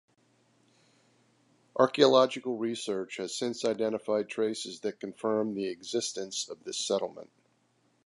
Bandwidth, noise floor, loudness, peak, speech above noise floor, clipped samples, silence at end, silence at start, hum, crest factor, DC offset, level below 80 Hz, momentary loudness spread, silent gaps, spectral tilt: 11.5 kHz; -71 dBFS; -30 LUFS; -8 dBFS; 41 dB; under 0.1%; 0.8 s; 1.75 s; none; 24 dB; under 0.1%; -80 dBFS; 13 LU; none; -3.5 dB/octave